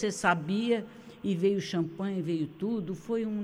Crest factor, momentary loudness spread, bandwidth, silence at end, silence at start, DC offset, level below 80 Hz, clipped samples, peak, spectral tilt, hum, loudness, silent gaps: 18 dB; 6 LU; 16.5 kHz; 0 s; 0 s; under 0.1%; -66 dBFS; under 0.1%; -12 dBFS; -6 dB/octave; none; -31 LUFS; none